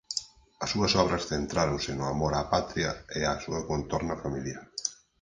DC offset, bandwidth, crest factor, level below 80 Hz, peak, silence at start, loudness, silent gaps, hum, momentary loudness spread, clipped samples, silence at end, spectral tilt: under 0.1%; 10.5 kHz; 22 dB; -46 dBFS; -8 dBFS; 0.1 s; -30 LUFS; none; none; 9 LU; under 0.1%; 0.25 s; -4 dB/octave